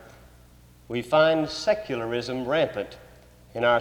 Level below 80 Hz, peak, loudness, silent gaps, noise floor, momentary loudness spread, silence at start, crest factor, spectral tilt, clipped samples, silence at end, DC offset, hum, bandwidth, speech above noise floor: -56 dBFS; -8 dBFS; -25 LUFS; none; -52 dBFS; 14 LU; 0 s; 18 dB; -5 dB/octave; under 0.1%; 0 s; under 0.1%; 60 Hz at -55 dBFS; 14 kHz; 28 dB